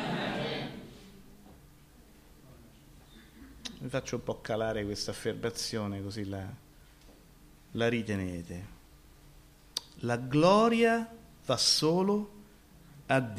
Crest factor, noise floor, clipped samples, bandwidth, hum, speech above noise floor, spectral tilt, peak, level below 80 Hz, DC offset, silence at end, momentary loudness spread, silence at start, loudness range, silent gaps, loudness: 22 dB; -57 dBFS; under 0.1%; 15.5 kHz; none; 27 dB; -4.5 dB/octave; -12 dBFS; -58 dBFS; under 0.1%; 0 s; 20 LU; 0 s; 15 LU; none; -31 LUFS